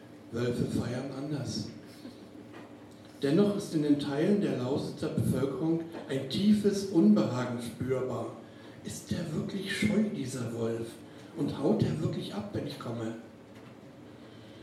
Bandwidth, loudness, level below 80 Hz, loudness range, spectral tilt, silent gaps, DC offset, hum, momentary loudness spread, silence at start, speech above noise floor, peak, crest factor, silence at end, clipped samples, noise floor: 14 kHz; -31 LUFS; -66 dBFS; 6 LU; -6.5 dB/octave; none; under 0.1%; none; 22 LU; 0 s; 20 dB; -12 dBFS; 20 dB; 0 s; under 0.1%; -50 dBFS